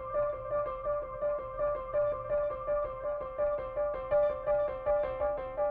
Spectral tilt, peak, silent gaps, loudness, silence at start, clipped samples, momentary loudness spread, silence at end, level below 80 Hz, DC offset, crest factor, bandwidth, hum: -9 dB/octave; -20 dBFS; none; -33 LUFS; 0 s; under 0.1%; 5 LU; 0 s; -52 dBFS; under 0.1%; 12 dB; 3.8 kHz; none